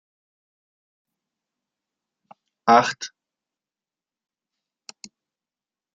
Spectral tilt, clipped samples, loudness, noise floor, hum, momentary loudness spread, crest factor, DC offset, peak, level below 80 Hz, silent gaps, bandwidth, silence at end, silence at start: -3.5 dB/octave; under 0.1%; -19 LUFS; under -90 dBFS; none; 26 LU; 28 dB; under 0.1%; 0 dBFS; -80 dBFS; none; 9.2 kHz; 2.85 s; 2.65 s